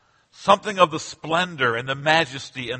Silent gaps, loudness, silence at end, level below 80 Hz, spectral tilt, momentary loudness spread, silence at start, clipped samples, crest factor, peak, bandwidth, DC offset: none; -21 LUFS; 0 s; -60 dBFS; -4 dB/octave; 8 LU; 0.4 s; under 0.1%; 22 dB; 0 dBFS; 8.8 kHz; under 0.1%